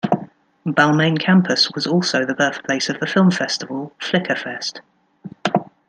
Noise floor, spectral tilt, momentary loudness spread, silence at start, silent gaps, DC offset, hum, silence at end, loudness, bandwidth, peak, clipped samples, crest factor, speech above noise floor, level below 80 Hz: -39 dBFS; -5 dB/octave; 11 LU; 0.05 s; none; under 0.1%; none; 0.25 s; -19 LUFS; 9.2 kHz; -2 dBFS; under 0.1%; 18 dB; 21 dB; -64 dBFS